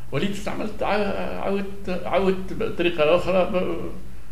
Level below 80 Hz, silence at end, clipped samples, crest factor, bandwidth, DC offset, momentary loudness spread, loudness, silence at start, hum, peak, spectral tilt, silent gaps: -42 dBFS; 0 s; under 0.1%; 18 dB; 15.5 kHz; 5%; 10 LU; -24 LUFS; 0 s; none; -6 dBFS; -6 dB/octave; none